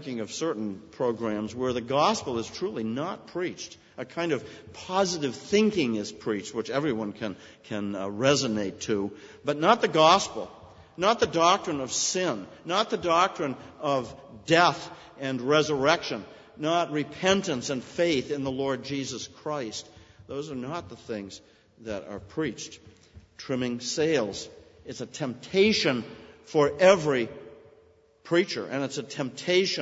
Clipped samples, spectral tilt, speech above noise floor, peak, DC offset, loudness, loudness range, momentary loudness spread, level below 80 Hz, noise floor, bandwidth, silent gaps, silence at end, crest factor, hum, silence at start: under 0.1%; -4 dB/octave; 32 dB; -4 dBFS; under 0.1%; -27 LUFS; 9 LU; 16 LU; -62 dBFS; -59 dBFS; 8 kHz; none; 0 s; 24 dB; none; 0 s